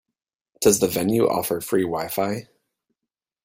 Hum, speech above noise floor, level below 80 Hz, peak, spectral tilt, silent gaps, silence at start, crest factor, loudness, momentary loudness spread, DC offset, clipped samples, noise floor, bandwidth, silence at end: none; 65 dB; -56 dBFS; -2 dBFS; -4.5 dB/octave; none; 0.6 s; 22 dB; -22 LUFS; 7 LU; under 0.1%; under 0.1%; -86 dBFS; 16.5 kHz; 1.05 s